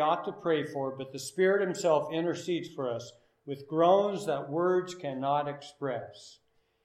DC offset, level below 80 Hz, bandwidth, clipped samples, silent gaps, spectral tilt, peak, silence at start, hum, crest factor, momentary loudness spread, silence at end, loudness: under 0.1%; -80 dBFS; 14 kHz; under 0.1%; none; -5.5 dB/octave; -12 dBFS; 0 s; none; 20 dB; 13 LU; 0.55 s; -30 LUFS